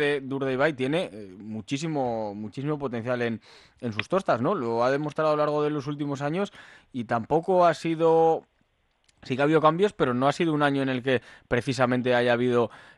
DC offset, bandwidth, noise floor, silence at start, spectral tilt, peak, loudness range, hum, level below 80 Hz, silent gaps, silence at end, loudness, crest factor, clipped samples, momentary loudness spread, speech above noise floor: under 0.1%; 11.5 kHz; -69 dBFS; 0 s; -6.5 dB/octave; -8 dBFS; 5 LU; none; -60 dBFS; none; 0.15 s; -25 LUFS; 18 dB; under 0.1%; 11 LU; 44 dB